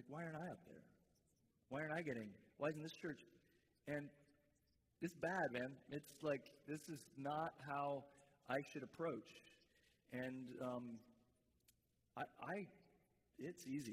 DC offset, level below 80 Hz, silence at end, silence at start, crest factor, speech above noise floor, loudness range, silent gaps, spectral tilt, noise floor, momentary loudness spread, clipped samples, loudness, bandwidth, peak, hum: under 0.1%; -84 dBFS; 0 s; 0 s; 20 dB; 34 dB; 6 LU; none; -6 dB/octave; -82 dBFS; 14 LU; under 0.1%; -49 LUFS; 15.5 kHz; -30 dBFS; none